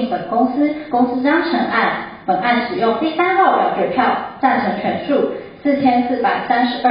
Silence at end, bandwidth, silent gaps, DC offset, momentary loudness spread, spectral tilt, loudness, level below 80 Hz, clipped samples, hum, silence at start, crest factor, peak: 0 s; 5.2 kHz; none; under 0.1%; 5 LU; -10.5 dB/octave; -17 LUFS; -54 dBFS; under 0.1%; none; 0 s; 14 dB; -2 dBFS